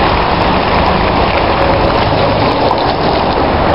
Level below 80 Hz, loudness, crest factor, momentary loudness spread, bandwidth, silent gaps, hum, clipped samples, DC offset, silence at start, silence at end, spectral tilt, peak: -22 dBFS; -11 LUFS; 12 dB; 1 LU; 6.6 kHz; none; none; under 0.1%; 2%; 0 s; 0 s; -8 dB/octave; 0 dBFS